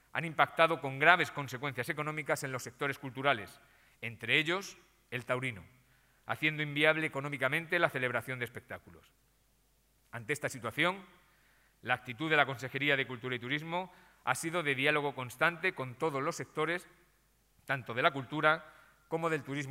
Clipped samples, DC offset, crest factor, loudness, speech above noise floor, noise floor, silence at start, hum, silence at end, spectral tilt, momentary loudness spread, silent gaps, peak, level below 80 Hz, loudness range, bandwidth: under 0.1%; under 0.1%; 28 dB; -33 LUFS; 37 dB; -71 dBFS; 0.15 s; none; 0 s; -4.5 dB/octave; 13 LU; none; -6 dBFS; -74 dBFS; 5 LU; 16 kHz